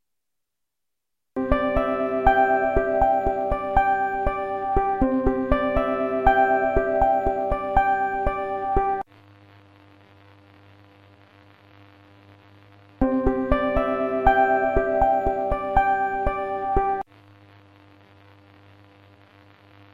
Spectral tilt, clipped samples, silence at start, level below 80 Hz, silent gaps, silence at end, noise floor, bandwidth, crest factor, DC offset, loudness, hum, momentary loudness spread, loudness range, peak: -8.5 dB/octave; under 0.1%; 1.35 s; -34 dBFS; none; 2.9 s; -85 dBFS; 7.2 kHz; 20 dB; under 0.1%; -22 LUFS; none; 7 LU; 9 LU; -4 dBFS